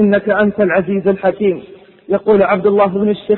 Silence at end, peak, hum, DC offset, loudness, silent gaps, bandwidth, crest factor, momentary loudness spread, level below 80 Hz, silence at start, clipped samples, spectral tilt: 0 s; -2 dBFS; none; under 0.1%; -14 LUFS; none; 4.2 kHz; 12 dB; 6 LU; -50 dBFS; 0 s; under 0.1%; -12 dB/octave